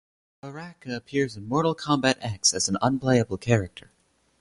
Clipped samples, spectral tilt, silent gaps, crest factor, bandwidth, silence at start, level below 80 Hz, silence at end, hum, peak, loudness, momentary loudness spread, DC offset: under 0.1%; -4 dB/octave; none; 20 dB; 11.5 kHz; 0.45 s; -54 dBFS; 0.6 s; none; -6 dBFS; -24 LUFS; 17 LU; under 0.1%